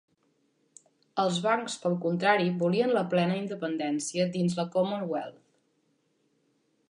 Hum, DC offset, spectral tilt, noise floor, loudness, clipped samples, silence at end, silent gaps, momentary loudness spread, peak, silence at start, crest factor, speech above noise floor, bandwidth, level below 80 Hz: none; under 0.1%; -5.5 dB/octave; -72 dBFS; -28 LUFS; under 0.1%; 1.6 s; none; 8 LU; -10 dBFS; 1.15 s; 20 dB; 45 dB; 11 kHz; -76 dBFS